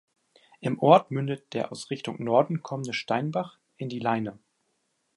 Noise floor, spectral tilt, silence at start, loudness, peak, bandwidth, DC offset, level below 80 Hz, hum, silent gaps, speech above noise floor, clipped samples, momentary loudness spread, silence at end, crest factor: -75 dBFS; -6.5 dB/octave; 0.6 s; -27 LUFS; -4 dBFS; 11.5 kHz; under 0.1%; -72 dBFS; none; none; 48 dB; under 0.1%; 15 LU; 0.85 s; 24 dB